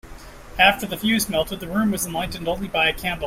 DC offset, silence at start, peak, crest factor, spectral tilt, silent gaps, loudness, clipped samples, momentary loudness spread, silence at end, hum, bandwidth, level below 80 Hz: under 0.1%; 0.05 s; -2 dBFS; 20 dB; -3.5 dB/octave; none; -21 LUFS; under 0.1%; 10 LU; 0 s; none; 16.5 kHz; -42 dBFS